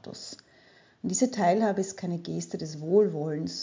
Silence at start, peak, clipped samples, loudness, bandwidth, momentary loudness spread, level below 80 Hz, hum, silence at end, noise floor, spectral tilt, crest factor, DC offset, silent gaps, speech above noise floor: 0.05 s; -10 dBFS; under 0.1%; -28 LUFS; 7.6 kHz; 16 LU; -70 dBFS; none; 0 s; -59 dBFS; -5 dB/octave; 18 dB; under 0.1%; none; 31 dB